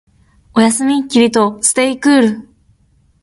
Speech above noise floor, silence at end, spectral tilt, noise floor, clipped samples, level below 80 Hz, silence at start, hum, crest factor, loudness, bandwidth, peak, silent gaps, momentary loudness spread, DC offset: 42 dB; 0.8 s; -3.5 dB/octave; -54 dBFS; under 0.1%; -54 dBFS; 0.55 s; none; 14 dB; -13 LUFS; 11.5 kHz; 0 dBFS; none; 5 LU; under 0.1%